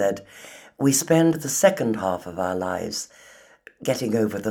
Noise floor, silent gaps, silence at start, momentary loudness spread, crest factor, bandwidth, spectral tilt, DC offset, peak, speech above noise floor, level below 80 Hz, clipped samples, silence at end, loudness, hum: -50 dBFS; none; 0 s; 17 LU; 20 dB; 19 kHz; -4.5 dB/octave; under 0.1%; -2 dBFS; 28 dB; -64 dBFS; under 0.1%; 0 s; -23 LUFS; none